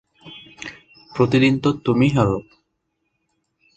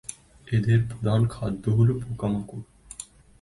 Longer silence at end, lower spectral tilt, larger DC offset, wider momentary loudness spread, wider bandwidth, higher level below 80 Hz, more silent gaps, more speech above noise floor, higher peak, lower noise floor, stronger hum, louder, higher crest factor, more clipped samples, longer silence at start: first, 1.35 s vs 0.35 s; about the same, -7 dB/octave vs -7.5 dB/octave; neither; about the same, 20 LU vs 18 LU; second, 8.6 kHz vs 11.5 kHz; about the same, -48 dBFS vs -48 dBFS; neither; first, 56 dB vs 21 dB; first, -2 dBFS vs -10 dBFS; first, -73 dBFS vs -44 dBFS; neither; first, -18 LUFS vs -25 LUFS; about the same, 20 dB vs 16 dB; neither; first, 0.25 s vs 0.1 s